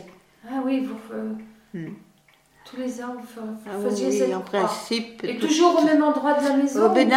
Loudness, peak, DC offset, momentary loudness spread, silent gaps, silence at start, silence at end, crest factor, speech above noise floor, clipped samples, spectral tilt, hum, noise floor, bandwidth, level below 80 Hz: -23 LUFS; -4 dBFS; under 0.1%; 18 LU; none; 0 s; 0 s; 18 dB; 36 dB; under 0.1%; -4.5 dB/octave; none; -58 dBFS; 15.5 kHz; -70 dBFS